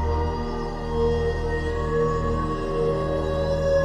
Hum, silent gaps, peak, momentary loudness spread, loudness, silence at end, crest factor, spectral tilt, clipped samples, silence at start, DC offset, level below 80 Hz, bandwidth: none; none; -12 dBFS; 5 LU; -25 LUFS; 0 s; 12 dB; -7.5 dB/octave; under 0.1%; 0 s; under 0.1%; -30 dBFS; 10 kHz